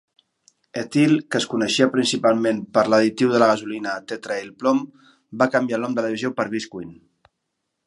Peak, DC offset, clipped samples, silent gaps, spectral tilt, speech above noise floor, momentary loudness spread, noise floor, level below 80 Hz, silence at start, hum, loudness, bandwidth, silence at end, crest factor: -2 dBFS; under 0.1%; under 0.1%; none; -4.5 dB/octave; 57 dB; 13 LU; -77 dBFS; -68 dBFS; 0.75 s; none; -21 LUFS; 11.5 kHz; 0.9 s; 20 dB